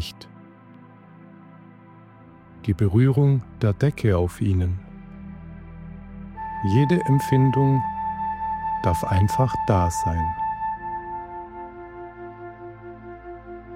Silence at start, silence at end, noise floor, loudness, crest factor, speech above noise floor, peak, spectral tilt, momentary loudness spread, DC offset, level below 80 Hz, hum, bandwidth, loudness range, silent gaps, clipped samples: 0 s; 0 s; -47 dBFS; -22 LUFS; 18 dB; 28 dB; -6 dBFS; -7.5 dB/octave; 21 LU; under 0.1%; -42 dBFS; none; 15 kHz; 6 LU; none; under 0.1%